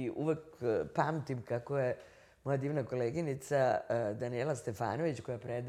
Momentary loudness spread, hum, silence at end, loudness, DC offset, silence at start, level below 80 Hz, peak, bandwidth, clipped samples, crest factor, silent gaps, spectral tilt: 7 LU; none; 0 s; -36 LUFS; under 0.1%; 0 s; -70 dBFS; -16 dBFS; 14.5 kHz; under 0.1%; 20 dB; none; -7 dB/octave